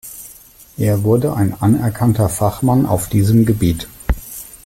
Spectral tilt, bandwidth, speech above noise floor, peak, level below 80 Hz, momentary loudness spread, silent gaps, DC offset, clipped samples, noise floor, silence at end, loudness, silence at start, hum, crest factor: -7 dB/octave; 16.5 kHz; 28 dB; -2 dBFS; -32 dBFS; 17 LU; none; under 0.1%; under 0.1%; -42 dBFS; 0.1 s; -16 LUFS; 0.05 s; none; 14 dB